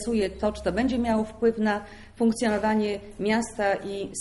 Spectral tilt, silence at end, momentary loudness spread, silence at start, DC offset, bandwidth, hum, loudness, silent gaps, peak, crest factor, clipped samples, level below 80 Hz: -5 dB/octave; 0 s; 6 LU; 0 s; under 0.1%; 11.5 kHz; none; -26 LUFS; none; -12 dBFS; 14 dB; under 0.1%; -46 dBFS